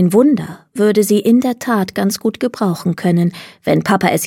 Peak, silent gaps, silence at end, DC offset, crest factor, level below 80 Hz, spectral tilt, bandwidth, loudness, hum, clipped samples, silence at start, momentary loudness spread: 0 dBFS; none; 0 s; under 0.1%; 14 dB; -56 dBFS; -6 dB/octave; 17 kHz; -15 LUFS; none; under 0.1%; 0 s; 7 LU